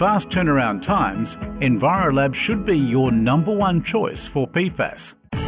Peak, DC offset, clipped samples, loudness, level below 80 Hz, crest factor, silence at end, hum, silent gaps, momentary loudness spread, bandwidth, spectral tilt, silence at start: -8 dBFS; under 0.1%; under 0.1%; -20 LUFS; -40 dBFS; 10 dB; 0 s; none; none; 8 LU; 4 kHz; -11 dB/octave; 0 s